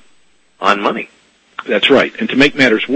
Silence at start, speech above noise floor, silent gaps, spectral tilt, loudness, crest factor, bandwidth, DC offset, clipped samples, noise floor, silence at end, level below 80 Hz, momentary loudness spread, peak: 0.6 s; 42 dB; none; -4.5 dB/octave; -13 LUFS; 14 dB; 9 kHz; under 0.1%; 0.1%; -55 dBFS; 0 s; -48 dBFS; 19 LU; 0 dBFS